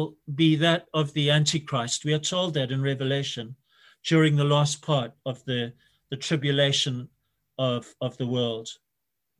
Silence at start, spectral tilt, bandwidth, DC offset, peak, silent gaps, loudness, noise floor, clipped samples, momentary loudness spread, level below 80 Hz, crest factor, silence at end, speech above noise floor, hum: 0 s; -5 dB/octave; 11.5 kHz; under 0.1%; -8 dBFS; none; -25 LUFS; -82 dBFS; under 0.1%; 14 LU; -66 dBFS; 18 dB; 0.65 s; 57 dB; none